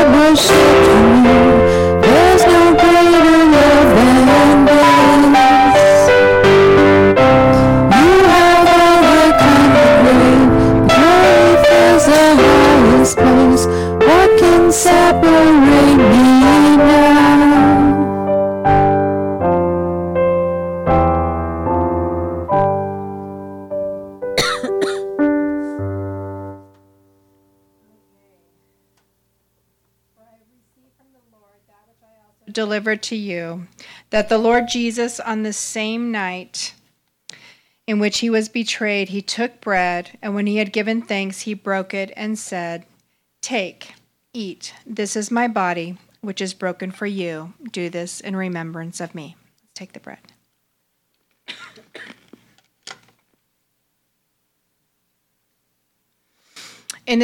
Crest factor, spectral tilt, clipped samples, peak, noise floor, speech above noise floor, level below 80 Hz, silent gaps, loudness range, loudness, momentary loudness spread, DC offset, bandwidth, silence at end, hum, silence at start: 8 dB; -5 dB/octave; under 0.1%; -4 dBFS; -70 dBFS; 48 dB; -34 dBFS; none; 19 LU; -11 LUFS; 19 LU; under 0.1%; 17 kHz; 0 s; none; 0 s